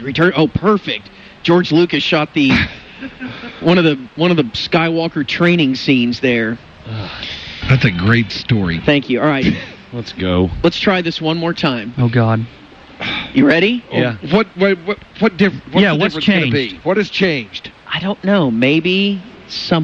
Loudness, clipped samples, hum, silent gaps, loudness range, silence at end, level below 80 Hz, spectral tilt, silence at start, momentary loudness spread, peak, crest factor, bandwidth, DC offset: -15 LUFS; under 0.1%; none; none; 2 LU; 0 s; -40 dBFS; -7 dB/octave; 0 s; 12 LU; -2 dBFS; 14 dB; 7.4 kHz; under 0.1%